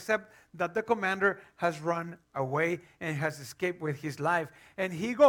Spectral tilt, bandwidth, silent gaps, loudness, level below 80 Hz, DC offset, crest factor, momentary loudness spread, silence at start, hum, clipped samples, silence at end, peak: -6 dB/octave; 18 kHz; none; -32 LUFS; -72 dBFS; under 0.1%; 20 dB; 7 LU; 0 s; none; under 0.1%; 0 s; -10 dBFS